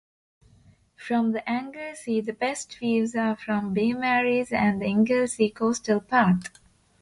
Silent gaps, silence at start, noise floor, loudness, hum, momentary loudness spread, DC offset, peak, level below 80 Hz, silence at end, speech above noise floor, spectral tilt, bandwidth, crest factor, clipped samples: none; 1 s; -58 dBFS; -25 LUFS; none; 8 LU; under 0.1%; -8 dBFS; -60 dBFS; 0.55 s; 33 dB; -5.5 dB/octave; 11.5 kHz; 18 dB; under 0.1%